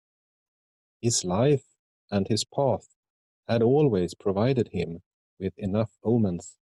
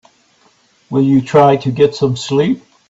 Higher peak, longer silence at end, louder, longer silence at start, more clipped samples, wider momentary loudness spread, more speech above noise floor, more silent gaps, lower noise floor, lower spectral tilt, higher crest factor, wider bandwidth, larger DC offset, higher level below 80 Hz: second, -10 dBFS vs 0 dBFS; about the same, 0.3 s vs 0.3 s; second, -26 LUFS vs -13 LUFS; first, 1.05 s vs 0.9 s; neither; first, 12 LU vs 7 LU; first, over 65 dB vs 41 dB; first, 1.79-2.08 s, 2.96-3.03 s, 3.10-3.43 s, 5.06-5.37 s vs none; first, under -90 dBFS vs -53 dBFS; second, -5.5 dB/octave vs -7 dB/octave; about the same, 16 dB vs 14 dB; first, 12.5 kHz vs 8 kHz; neither; second, -62 dBFS vs -54 dBFS